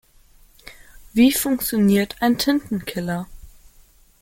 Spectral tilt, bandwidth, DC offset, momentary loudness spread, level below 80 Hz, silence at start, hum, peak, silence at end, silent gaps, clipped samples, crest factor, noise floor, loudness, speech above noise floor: -4.5 dB/octave; 17 kHz; under 0.1%; 11 LU; -48 dBFS; 0.65 s; none; -6 dBFS; 0.75 s; none; under 0.1%; 16 dB; -52 dBFS; -20 LUFS; 33 dB